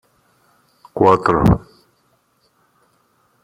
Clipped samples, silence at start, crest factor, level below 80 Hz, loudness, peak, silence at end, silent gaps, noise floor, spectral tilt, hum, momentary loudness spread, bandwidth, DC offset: under 0.1%; 0.95 s; 18 dB; -36 dBFS; -15 LUFS; -2 dBFS; 1.85 s; none; -62 dBFS; -8.5 dB/octave; none; 9 LU; 15.5 kHz; under 0.1%